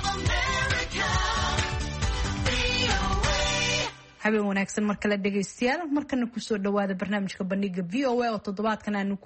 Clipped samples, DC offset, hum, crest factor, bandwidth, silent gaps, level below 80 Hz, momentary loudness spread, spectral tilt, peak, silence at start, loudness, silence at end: under 0.1%; under 0.1%; none; 18 dB; 8.8 kHz; none; -36 dBFS; 5 LU; -4 dB/octave; -10 dBFS; 0 s; -27 LUFS; 0.1 s